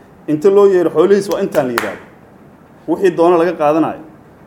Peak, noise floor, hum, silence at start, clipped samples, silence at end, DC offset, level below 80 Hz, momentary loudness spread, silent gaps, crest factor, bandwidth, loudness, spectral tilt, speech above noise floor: 0 dBFS; -42 dBFS; none; 0.3 s; under 0.1%; 0.45 s; under 0.1%; -56 dBFS; 14 LU; none; 14 dB; 17.5 kHz; -13 LUFS; -6.5 dB/octave; 30 dB